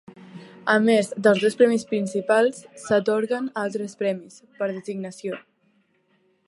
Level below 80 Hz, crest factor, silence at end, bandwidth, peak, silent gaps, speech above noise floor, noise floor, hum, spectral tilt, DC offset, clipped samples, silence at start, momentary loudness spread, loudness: -74 dBFS; 18 dB; 1.1 s; 11.5 kHz; -4 dBFS; none; 43 dB; -65 dBFS; none; -5 dB/octave; under 0.1%; under 0.1%; 0.2 s; 15 LU; -23 LUFS